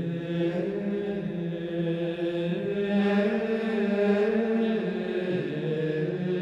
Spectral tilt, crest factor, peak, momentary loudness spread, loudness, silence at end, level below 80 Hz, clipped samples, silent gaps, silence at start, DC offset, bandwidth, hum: -8.5 dB/octave; 14 dB; -12 dBFS; 6 LU; -28 LUFS; 0 s; -62 dBFS; under 0.1%; none; 0 s; under 0.1%; 7.8 kHz; none